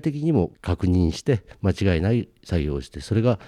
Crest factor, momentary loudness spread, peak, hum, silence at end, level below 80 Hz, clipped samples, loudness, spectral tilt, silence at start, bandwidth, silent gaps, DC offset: 14 dB; 5 LU; -8 dBFS; none; 0 s; -38 dBFS; under 0.1%; -24 LUFS; -7.5 dB/octave; 0.05 s; 11 kHz; none; under 0.1%